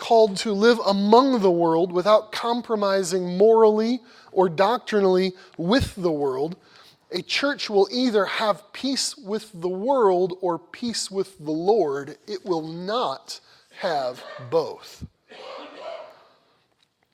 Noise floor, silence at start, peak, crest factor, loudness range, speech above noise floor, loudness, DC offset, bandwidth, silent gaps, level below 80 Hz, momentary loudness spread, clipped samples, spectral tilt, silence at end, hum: -67 dBFS; 0 s; -2 dBFS; 20 dB; 10 LU; 45 dB; -22 LUFS; under 0.1%; 14.5 kHz; none; -54 dBFS; 19 LU; under 0.1%; -5 dB/octave; 1.05 s; none